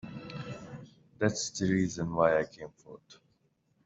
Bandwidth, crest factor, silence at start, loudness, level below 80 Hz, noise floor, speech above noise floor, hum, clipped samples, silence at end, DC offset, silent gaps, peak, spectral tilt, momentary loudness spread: 8 kHz; 22 dB; 0.05 s; -31 LUFS; -64 dBFS; -73 dBFS; 42 dB; none; under 0.1%; 0.7 s; under 0.1%; none; -10 dBFS; -5 dB/octave; 21 LU